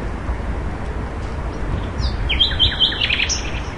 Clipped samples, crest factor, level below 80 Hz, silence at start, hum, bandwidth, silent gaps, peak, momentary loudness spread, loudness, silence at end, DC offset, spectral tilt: under 0.1%; 18 dB; -26 dBFS; 0 s; none; 11 kHz; none; -4 dBFS; 13 LU; -19 LUFS; 0 s; 0.7%; -3 dB/octave